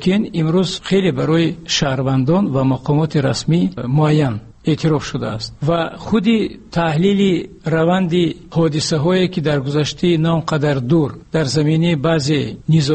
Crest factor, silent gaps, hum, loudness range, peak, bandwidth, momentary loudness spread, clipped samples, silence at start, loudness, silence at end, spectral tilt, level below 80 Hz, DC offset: 12 dB; none; none; 1 LU; -4 dBFS; 8.8 kHz; 5 LU; under 0.1%; 0 s; -17 LUFS; 0 s; -6.5 dB/octave; -44 dBFS; 0.1%